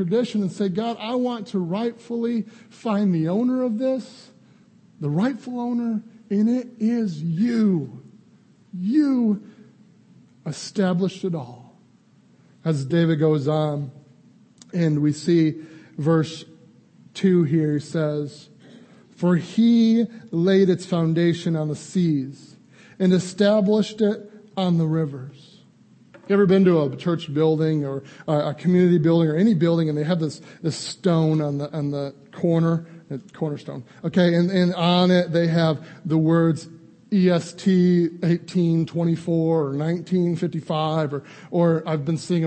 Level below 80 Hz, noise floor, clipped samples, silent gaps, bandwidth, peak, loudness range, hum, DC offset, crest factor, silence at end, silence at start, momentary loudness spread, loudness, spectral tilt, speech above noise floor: -66 dBFS; -55 dBFS; under 0.1%; none; 8.8 kHz; -4 dBFS; 5 LU; none; under 0.1%; 18 dB; 0 s; 0 s; 12 LU; -22 LUFS; -7.5 dB/octave; 35 dB